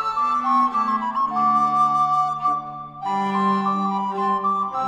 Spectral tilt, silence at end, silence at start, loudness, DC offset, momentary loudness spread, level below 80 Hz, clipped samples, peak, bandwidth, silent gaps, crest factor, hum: -6.5 dB/octave; 0 s; 0 s; -21 LUFS; under 0.1%; 6 LU; -62 dBFS; under 0.1%; -10 dBFS; 9 kHz; none; 12 dB; none